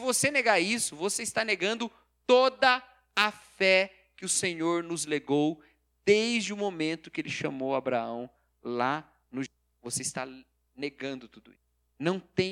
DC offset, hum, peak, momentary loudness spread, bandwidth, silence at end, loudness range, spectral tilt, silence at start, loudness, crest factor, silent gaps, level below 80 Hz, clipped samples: under 0.1%; none; -6 dBFS; 15 LU; 16.5 kHz; 0 s; 9 LU; -3 dB/octave; 0 s; -28 LUFS; 22 dB; none; -70 dBFS; under 0.1%